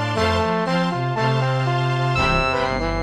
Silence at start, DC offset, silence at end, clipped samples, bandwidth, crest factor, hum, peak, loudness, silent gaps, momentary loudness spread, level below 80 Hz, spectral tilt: 0 s; 0.2%; 0 s; under 0.1%; 10 kHz; 14 dB; none; -6 dBFS; -20 LUFS; none; 3 LU; -34 dBFS; -6 dB/octave